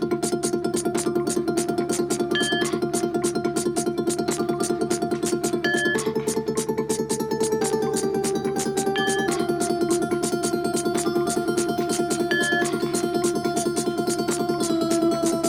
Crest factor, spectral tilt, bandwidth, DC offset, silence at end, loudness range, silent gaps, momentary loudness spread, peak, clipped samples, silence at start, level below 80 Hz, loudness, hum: 14 dB; -4 dB/octave; 17.5 kHz; under 0.1%; 0 s; 1 LU; none; 3 LU; -10 dBFS; under 0.1%; 0 s; -54 dBFS; -24 LUFS; none